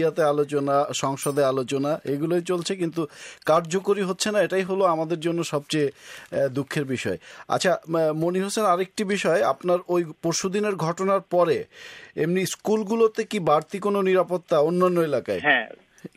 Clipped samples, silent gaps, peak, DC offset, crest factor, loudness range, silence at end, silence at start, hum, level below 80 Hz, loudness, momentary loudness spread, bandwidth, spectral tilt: under 0.1%; none; -6 dBFS; under 0.1%; 18 dB; 3 LU; 0.1 s; 0 s; none; -68 dBFS; -24 LUFS; 7 LU; 15.5 kHz; -5 dB/octave